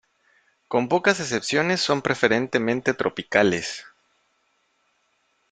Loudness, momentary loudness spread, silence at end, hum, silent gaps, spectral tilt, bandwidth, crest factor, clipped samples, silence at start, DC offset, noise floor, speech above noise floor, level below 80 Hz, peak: -22 LUFS; 6 LU; 1.7 s; none; none; -4 dB/octave; 9.6 kHz; 22 dB; under 0.1%; 0.7 s; under 0.1%; -69 dBFS; 46 dB; -62 dBFS; -2 dBFS